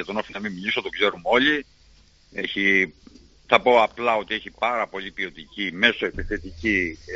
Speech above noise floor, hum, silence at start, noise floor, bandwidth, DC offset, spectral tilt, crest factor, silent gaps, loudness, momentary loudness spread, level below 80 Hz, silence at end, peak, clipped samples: 31 dB; none; 0 s; -54 dBFS; 7.6 kHz; under 0.1%; -1 dB/octave; 24 dB; none; -22 LUFS; 12 LU; -46 dBFS; 0 s; 0 dBFS; under 0.1%